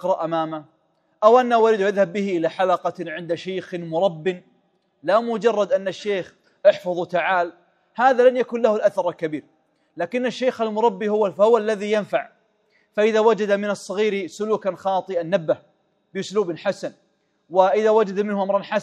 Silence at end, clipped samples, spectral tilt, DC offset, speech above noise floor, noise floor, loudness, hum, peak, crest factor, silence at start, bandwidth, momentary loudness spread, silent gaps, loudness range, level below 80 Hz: 0 s; under 0.1%; -5.5 dB/octave; under 0.1%; 44 dB; -65 dBFS; -21 LUFS; none; -2 dBFS; 20 dB; 0 s; 10 kHz; 12 LU; none; 4 LU; -76 dBFS